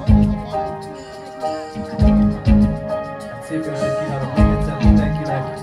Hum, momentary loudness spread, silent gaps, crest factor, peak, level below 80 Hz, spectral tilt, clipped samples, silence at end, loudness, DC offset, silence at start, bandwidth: none; 14 LU; none; 18 dB; 0 dBFS; -24 dBFS; -8.5 dB/octave; under 0.1%; 0 s; -19 LUFS; under 0.1%; 0 s; 11 kHz